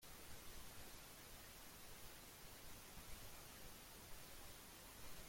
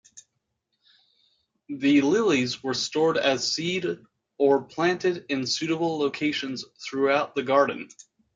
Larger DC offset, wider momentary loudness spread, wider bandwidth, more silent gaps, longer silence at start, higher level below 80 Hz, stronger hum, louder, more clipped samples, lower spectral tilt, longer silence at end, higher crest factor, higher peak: neither; second, 1 LU vs 12 LU; first, 16.5 kHz vs 9.2 kHz; neither; second, 0 s vs 0.15 s; about the same, -66 dBFS vs -68 dBFS; neither; second, -58 LUFS vs -24 LUFS; neither; second, -2.5 dB/octave vs -4 dB/octave; second, 0 s vs 0.5 s; about the same, 16 dB vs 18 dB; second, -40 dBFS vs -8 dBFS